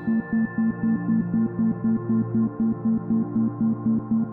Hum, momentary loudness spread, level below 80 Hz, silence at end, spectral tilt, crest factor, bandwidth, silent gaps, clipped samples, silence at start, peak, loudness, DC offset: none; 2 LU; -54 dBFS; 0 s; -14 dB/octave; 10 dB; 2 kHz; none; under 0.1%; 0 s; -14 dBFS; -24 LUFS; under 0.1%